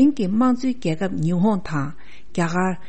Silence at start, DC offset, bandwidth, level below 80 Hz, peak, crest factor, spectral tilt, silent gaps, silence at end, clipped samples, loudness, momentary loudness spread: 0 s; 3%; 8.6 kHz; -50 dBFS; -6 dBFS; 14 dB; -7.5 dB/octave; none; 0.1 s; under 0.1%; -22 LUFS; 8 LU